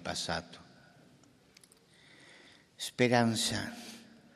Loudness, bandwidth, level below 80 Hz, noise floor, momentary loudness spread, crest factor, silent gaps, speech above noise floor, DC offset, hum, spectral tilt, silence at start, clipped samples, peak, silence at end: -32 LUFS; 14 kHz; -68 dBFS; -62 dBFS; 26 LU; 26 dB; none; 30 dB; under 0.1%; none; -4 dB/octave; 0 s; under 0.1%; -10 dBFS; 0.35 s